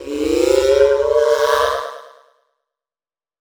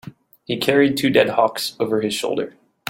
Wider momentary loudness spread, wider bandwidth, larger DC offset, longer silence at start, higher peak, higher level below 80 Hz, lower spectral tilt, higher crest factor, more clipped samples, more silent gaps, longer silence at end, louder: about the same, 8 LU vs 10 LU; first, over 20 kHz vs 17 kHz; neither; about the same, 0 s vs 0.05 s; about the same, 0 dBFS vs -2 dBFS; first, -44 dBFS vs -60 dBFS; about the same, -3.5 dB/octave vs -4.5 dB/octave; about the same, 18 dB vs 18 dB; neither; neither; first, 1.35 s vs 0.4 s; first, -15 LUFS vs -19 LUFS